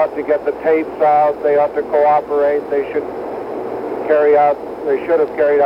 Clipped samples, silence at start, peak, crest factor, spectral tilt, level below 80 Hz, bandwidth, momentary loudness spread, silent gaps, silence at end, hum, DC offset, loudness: under 0.1%; 0 s; -2 dBFS; 12 dB; -7 dB/octave; -54 dBFS; 5.6 kHz; 11 LU; none; 0 s; none; under 0.1%; -16 LUFS